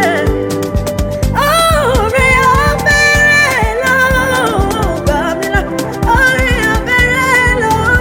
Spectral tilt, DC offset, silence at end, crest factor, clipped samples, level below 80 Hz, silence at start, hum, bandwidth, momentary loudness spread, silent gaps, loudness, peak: -4.5 dB/octave; under 0.1%; 0 s; 10 dB; under 0.1%; -22 dBFS; 0 s; none; 17.5 kHz; 8 LU; none; -11 LUFS; 0 dBFS